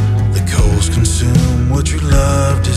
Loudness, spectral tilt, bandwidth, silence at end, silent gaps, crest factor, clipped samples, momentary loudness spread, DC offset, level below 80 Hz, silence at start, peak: -13 LUFS; -5.5 dB/octave; 14 kHz; 0 s; none; 10 dB; under 0.1%; 2 LU; under 0.1%; -18 dBFS; 0 s; -2 dBFS